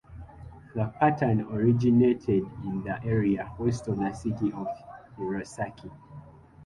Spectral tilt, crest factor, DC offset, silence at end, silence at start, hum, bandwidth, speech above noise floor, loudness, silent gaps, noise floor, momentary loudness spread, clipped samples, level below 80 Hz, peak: -8.5 dB/octave; 18 dB; under 0.1%; 0 s; 0.1 s; none; 11.5 kHz; 22 dB; -28 LUFS; none; -48 dBFS; 24 LU; under 0.1%; -52 dBFS; -10 dBFS